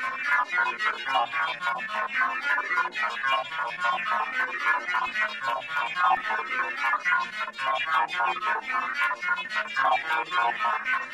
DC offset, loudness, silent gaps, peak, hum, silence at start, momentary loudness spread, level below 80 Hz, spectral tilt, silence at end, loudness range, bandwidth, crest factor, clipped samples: under 0.1%; -26 LUFS; none; -10 dBFS; none; 0 s; 4 LU; -72 dBFS; -1.5 dB/octave; 0 s; 1 LU; 15 kHz; 16 dB; under 0.1%